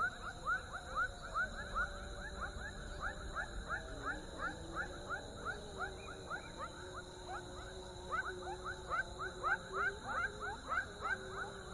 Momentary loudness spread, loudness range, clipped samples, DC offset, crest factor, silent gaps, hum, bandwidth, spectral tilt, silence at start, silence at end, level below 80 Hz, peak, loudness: 8 LU; 5 LU; under 0.1%; under 0.1%; 20 dB; none; none; 11.5 kHz; -3.5 dB/octave; 0 s; 0 s; -54 dBFS; -24 dBFS; -42 LUFS